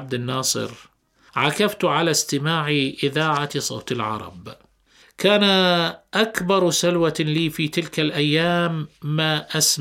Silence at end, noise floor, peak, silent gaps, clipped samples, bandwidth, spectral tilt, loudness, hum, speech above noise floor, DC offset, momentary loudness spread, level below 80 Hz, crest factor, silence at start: 0 s; -55 dBFS; -2 dBFS; none; under 0.1%; 16.5 kHz; -3.5 dB/octave; -20 LUFS; none; 34 dB; under 0.1%; 9 LU; -60 dBFS; 20 dB; 0 s